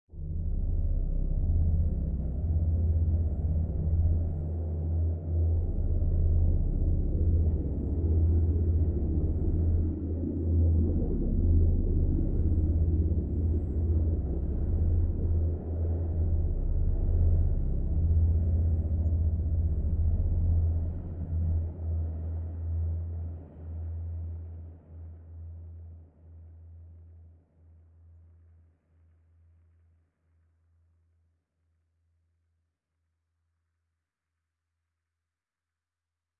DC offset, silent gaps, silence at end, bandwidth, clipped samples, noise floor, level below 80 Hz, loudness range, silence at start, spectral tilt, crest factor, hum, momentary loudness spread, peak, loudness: under 0.1%; none; 9.1 s; 1.4 kHz; under 0.1%; under -90 dBFS; -32 dBFS; 11 LU; 0.15 s; -14 dB/octave; 14 dB; none; 11 LU; -14 dBFS; -30 LUFS